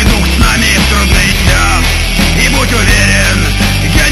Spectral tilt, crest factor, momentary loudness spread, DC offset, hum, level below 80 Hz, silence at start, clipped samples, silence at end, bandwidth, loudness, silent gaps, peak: -3.5 dB/octave; 8 dB; 3 LU; 0.3%; none; -12 dBFS; 0 s; 0.8%; 0 s; 16 kHz; -8 LUFS; none; 0 dBFS